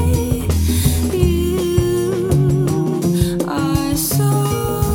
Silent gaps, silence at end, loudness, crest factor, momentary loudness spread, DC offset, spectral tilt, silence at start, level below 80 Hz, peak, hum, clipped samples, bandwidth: none; 0 s; -17 LUFS; 14 dB; 3 LU; under 0.1%; -6 dB/octave; 0 s; -26 dBFS; -2 dBFS; none; under 0.1%; 17.5 kHz